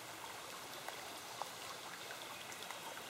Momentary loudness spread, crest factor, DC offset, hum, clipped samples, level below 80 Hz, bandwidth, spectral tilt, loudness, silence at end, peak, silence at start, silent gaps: 2 LU; 24 dB; under 0.1%; none; under 0.1%; -82 dBFS; 16 kHz; -1 dB/octave; -47 LUFS; 0 s; -26 dBFS; 0 s; none